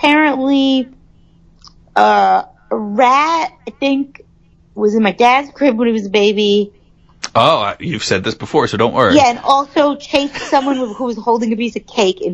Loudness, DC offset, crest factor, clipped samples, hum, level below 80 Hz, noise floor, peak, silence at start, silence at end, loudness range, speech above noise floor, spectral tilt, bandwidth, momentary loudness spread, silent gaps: -14 LUFS; under 0.1%; 14 dB; under 0.1%; none; -50 dBFS; -49 dBFS; 0 dBFS; 0 s; 0 s; 1 LU; 35 dB; -4.5 dB/octave; 11 kHz; 9 LU; none